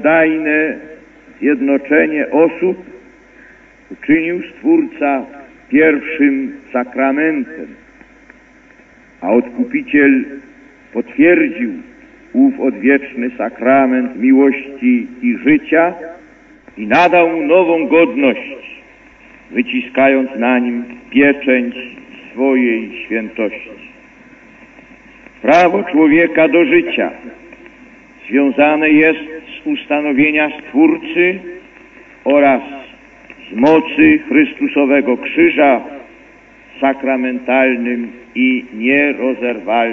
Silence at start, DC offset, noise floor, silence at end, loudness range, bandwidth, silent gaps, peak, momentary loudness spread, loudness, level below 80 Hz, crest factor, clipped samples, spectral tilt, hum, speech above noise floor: 0 s; under 0.1%; -45 dBFS; 0 s; 5 LU; 6.6 kHz; none; 0 dBFS; 15 LU; -13 LUFS; -54 dBFS; 14 dB; under 0.1%; -7 dB/octave; none; 32 dB